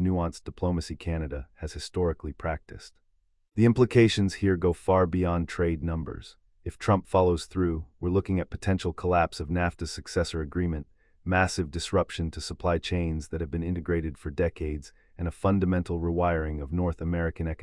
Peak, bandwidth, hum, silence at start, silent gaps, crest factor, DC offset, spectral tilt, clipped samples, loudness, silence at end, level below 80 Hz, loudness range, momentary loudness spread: -8 dBFS; 11.5 kHz; none; 0 s; none; 18 dB; under 0.1%; -6.5 dB/octave; under 0.1%; -28 LUFS; 0 s; -44 dBFS; 5 LU; 12 LU